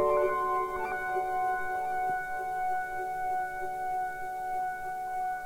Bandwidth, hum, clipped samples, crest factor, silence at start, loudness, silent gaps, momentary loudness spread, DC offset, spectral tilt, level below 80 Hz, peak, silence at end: 16 kHz; none; under 0.1%; 16 dB; 0 s; -32 LUFS; none; 6 LU; under 0.1%; -5 dB/octave; -56 dBFS; -16 dBFS; 0 s